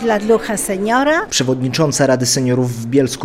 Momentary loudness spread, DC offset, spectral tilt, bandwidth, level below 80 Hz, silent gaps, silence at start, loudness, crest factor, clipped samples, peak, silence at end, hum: 4 LU; under 0.1%; -4.5 dB/octave; 16.5 kHz; -46 dBFS; none; 0 s; -15 LUFS; 14 dB; under 0.1%; -2 dBFS; 0 s; none